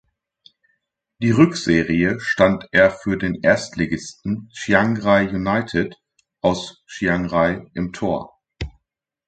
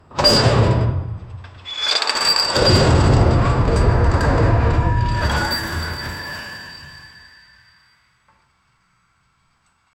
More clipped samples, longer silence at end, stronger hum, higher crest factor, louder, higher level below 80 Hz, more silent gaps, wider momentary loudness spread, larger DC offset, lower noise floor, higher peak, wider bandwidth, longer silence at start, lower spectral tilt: neither; second, 0.6 s vs 2.9 s; neither; about the same, 20 dB vs 16 dB; about the same, -19 LUFS vs -17 LUFS; second, -44 dBFS vs -26 dBFS; neither; second, 12 LU vs 19 LU; neither; first, -78 dBFS vs -62 dBFS; about the same, 0 dBFS vs -2 dBFS; second, 9.2 kHz vs 17 kHz; first, 1.2 s vs 0.1 s; about the same, -6 dB/octave vs -5 dB/octave